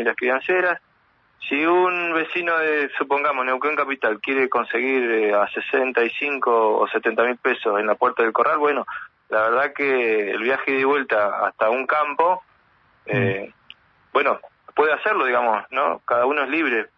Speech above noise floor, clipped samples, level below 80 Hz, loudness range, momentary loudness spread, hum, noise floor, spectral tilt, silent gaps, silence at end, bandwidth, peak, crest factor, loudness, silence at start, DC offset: 40 dB; under 0.1%; -72 dBFS; 3 LU; 4 LU; none; -61 dBFS; -7.5 dB/octave; none; 0.1 s; 6 kHz; -4 dBFS; 18 dB; -21 LUFS; 0 s; under 0.1%